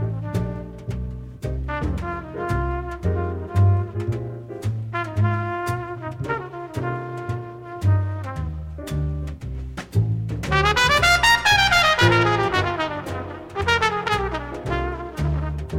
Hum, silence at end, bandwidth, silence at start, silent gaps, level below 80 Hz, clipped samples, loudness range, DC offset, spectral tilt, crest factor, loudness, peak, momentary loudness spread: none; 0 s; 16.5 kHz; 0 s; none; -34 dBFS; under 0.1%; 10 LU; under 0.1%; -5 dB/octave; 18 dB; -22 LUFS; -4 dBFS; 16 LU